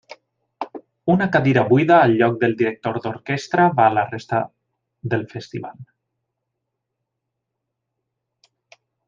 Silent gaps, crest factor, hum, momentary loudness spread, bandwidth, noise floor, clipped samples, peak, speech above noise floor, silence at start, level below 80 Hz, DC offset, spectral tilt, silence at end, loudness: none; 20 dB; none; 19 LU; 7.4 kHz; -80 dBFS; under 0.1%; -2 dBFS; 62 dB; 0.6 s; -64 dBFS; under 0.1%; -7.5 dB/octave; 3.25 s; -18 LUFS